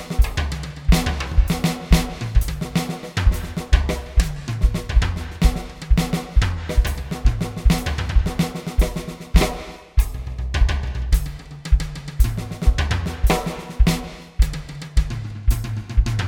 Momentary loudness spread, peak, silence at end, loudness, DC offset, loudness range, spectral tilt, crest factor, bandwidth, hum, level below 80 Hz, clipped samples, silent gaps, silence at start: 7 LU; 0 dBFS; 0 s; -23 LUFS; under 0.1%; 2 LU; -5.5 dB/octave; 20 dB; 17 kHz; none; -20 dBFS; under 0.1%; none; 0 s